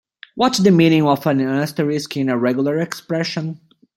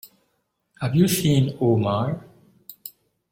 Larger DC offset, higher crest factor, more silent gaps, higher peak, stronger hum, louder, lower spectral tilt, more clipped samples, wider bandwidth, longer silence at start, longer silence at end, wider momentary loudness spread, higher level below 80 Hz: neither; about the same, 16 dB vs 18 dB; neither; first, -2 dBFS vs -6 dBFS; neither; first, -18 LUFS vs -21 LUFS; about the same, -6 dB/octave vs -6 dB/octave; neither; about the same, 16.5 kHz vs 16.5 kHz; first, 0.35 s vs 0.05 s; about the same, 0.4 s vs 0.4 s; second, 12 LU vs 20 LU; second, -60 dBFS vs -54 dBFS